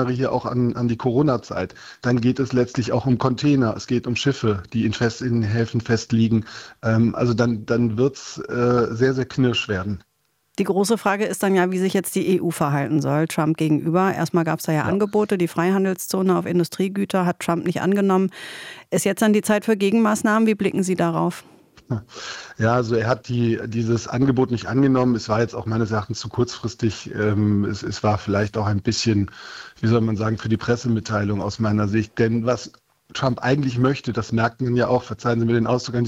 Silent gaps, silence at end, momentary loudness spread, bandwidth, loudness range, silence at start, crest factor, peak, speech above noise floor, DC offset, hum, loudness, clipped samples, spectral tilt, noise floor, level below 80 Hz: none; 0 s; 7 LU; 16.5 kHz; 2 LU; 0 s; 18 dB; -4 dBFS; 44 dB; under 0.1%; none; -21 LUFS; under 0.1%; -6.5 dB/octave; -64 dBFS; -52 dBFS